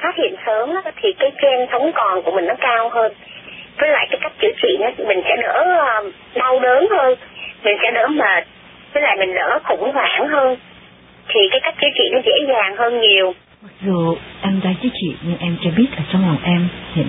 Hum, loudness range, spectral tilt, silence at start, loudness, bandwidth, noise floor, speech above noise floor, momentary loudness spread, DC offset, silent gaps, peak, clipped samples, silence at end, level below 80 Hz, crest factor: none; 3 LU; -10.5 dB/octave; 0 s; -16 LUFS; 4 kHz; -44 dBFS; 28 dB; 9 LU; under 0.1%; none; -2 dBFS; under 0.1%; 0 s; -52 dBFS; 16 dB